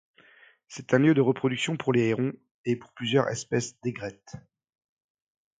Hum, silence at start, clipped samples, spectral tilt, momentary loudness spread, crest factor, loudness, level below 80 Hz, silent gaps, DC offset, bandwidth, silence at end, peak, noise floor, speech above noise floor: none; 0.7 s; under 0.1%; -5.5 dB/octave; 21 LU; 22 dB; -26 LUFS; -66 dBFS; 2.51-2.64 s; under 0.1%; 9.4 kHz; 1.2 s; -8 dBFS; -58 dBFS; 31 dB